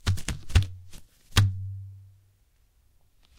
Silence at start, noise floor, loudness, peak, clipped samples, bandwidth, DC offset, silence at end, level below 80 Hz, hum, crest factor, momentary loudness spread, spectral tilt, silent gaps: 0.05 s; -64 dBFS; -28 LUFS; -2 dBFS; under 0.1%; 17 kHz; under 0.1%; 1.35 s; -36 dBFS; none; 28 dB; 19 LU; -4 dB/octave; none